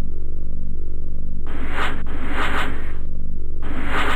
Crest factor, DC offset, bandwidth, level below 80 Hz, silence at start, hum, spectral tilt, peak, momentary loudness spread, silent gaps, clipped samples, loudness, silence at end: 8 dB; under 0.1%; 4.2 kHz; -20 dBFS; 0 s; none; -5.5 dB/octave; -6 dBFS; 9 LU; none; under 0.1%; -28 LUFS; 0 s